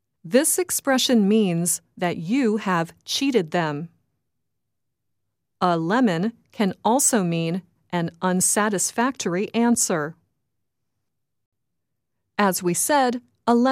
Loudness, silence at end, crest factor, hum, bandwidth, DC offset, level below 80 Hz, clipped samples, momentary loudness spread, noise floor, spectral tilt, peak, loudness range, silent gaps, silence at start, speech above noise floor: -22 LUFS; 0 s; 18 dB; none; 16 kHz; under 0.1%; -70 dBFS; under 0.1%; 9 LU; -82 dBFS; -4 dB/octave; -6 dBFS; 5 LU; 11.46-11.52 s; 0.25 s; 60 dB